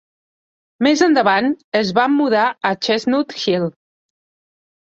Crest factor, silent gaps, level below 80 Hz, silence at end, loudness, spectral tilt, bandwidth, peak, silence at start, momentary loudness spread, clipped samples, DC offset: 16 dB; 1.64-1.72 s; -62 dBFS; 1.2 s; -17 LUFS; -4.5 dB/octave; 7.8 kHz; -2 dBFS; 0.8 s; 6 LU; under 0.1%; under 0.1%